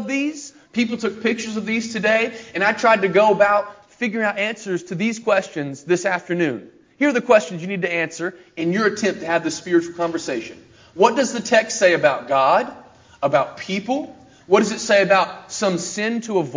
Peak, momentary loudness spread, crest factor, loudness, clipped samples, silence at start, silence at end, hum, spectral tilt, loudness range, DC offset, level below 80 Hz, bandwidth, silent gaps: 0 dBFS; 11 LU; 20 dB; -20 LUFS; under 0.1%; 0 s; 0 s; none; -4 dB/octave; 3 LU; under 0.1%; -64 dBFS; 7.6 kHz; none